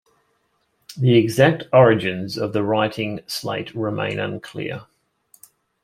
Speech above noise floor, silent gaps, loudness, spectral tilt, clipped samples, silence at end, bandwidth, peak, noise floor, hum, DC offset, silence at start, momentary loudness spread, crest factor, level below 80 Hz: 48 dB; none; -20 LUFS; -6.5 dB/octave; under 0.1%; 1 s; 16 kHz; -2 dBFS; -68 dBFS; none; under 0.1%; 0.9 s; 15 LU; 20 dB; -60 dBFS